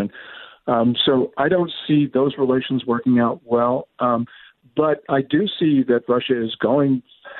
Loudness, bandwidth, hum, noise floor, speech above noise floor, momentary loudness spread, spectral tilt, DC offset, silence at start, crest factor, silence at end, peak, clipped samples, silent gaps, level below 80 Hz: -20 LUFS; 4.3 kHz; none; -40 dBFS; 21 dB; 7 LU; -10.5 dB/octave; under 0.1%; 0 s; 16 dB; 0 s; -4 dBFS; under 0.1%; none; -60 dBFS